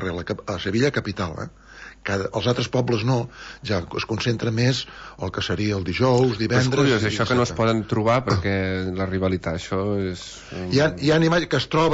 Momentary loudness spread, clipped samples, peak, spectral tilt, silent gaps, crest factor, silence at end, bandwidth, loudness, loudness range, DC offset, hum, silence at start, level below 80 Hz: 12 LU; under 0.1%; -8 dBFS; -6 dB/octave; none; 16 dB; 0 s; 8 kHz; -22 LUFS; 4 LU; under 0.1%; none; 0 s; -46 dBFS